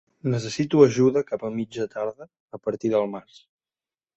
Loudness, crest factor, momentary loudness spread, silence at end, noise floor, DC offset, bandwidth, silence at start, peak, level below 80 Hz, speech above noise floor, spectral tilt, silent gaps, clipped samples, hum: -24 LUFS; 22 dB; 15 LU; 0.95 s; under -90 dBFS; under 0.1%; 8.2 kHz; 0.25 s; -4 dBFS; -64 dBFS; over 67 dB; -6.5 dB/octave; 2.40-2.48 s; under 0.1%; none